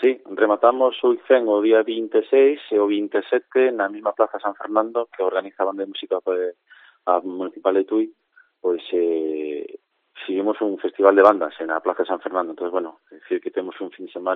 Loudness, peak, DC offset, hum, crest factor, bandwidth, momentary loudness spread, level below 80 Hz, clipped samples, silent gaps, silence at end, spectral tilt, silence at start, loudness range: -21 LUFS; 0 dBFS; under 0.1%; none; 20 dB; 4.1 kHz; 12 LU; -76 dBFS; under 0.1%; none; 0 s; -2 dB/octave; 0 s; 6 LU